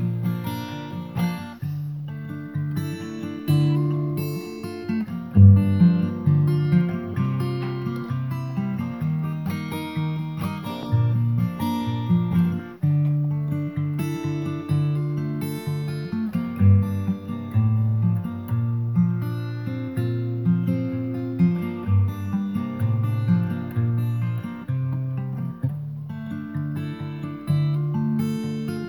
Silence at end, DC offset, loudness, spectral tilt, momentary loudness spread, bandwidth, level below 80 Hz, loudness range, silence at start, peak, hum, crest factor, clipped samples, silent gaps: 0 s; under 0.1%; -24 LUFS; -9 dB/octave; 10 LU; 19 kHz; -56 dBFS; 8 LU; 0 s; -2 dBFS; none; 20 dB; under 0.1%; none